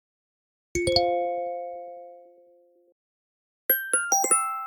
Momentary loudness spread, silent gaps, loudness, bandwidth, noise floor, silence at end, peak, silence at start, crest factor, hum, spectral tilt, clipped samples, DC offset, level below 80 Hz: 18 LU; 2.92-3.69 s; -24 LUFS; 20 kHz; -59 dBFS; 0 s; -6 dBFS; 0.75 s; 22 dB; none; -1.5 dB/octave; under 0.1%; under 0.1%; -54 dBFS